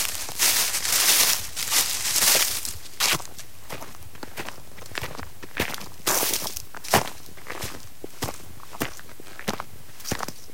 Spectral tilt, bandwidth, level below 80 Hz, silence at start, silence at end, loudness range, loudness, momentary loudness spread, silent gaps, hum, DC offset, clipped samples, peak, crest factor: -0.5 dB/octave; 17 kHz; -52 dBFS; 0 s; 0 s; 11 LU; -23 LUFS; 23 LU; none; none; 2%; under 0.1%; -2 dBFS; 24 dB